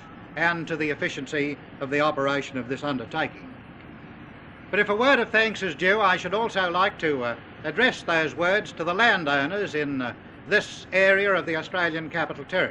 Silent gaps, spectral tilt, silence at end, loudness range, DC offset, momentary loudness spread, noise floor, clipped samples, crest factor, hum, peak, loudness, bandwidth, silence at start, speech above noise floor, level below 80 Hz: none; -4.5 dB/octave; 0 s; 5 LU; under 0.1%; 17 LU; -44 dBFS; under 0.1%; 20 dB; none; -6 dBFS; -24 LUFS; 10 kHz; 0 s; 19 dB; -58 dBFS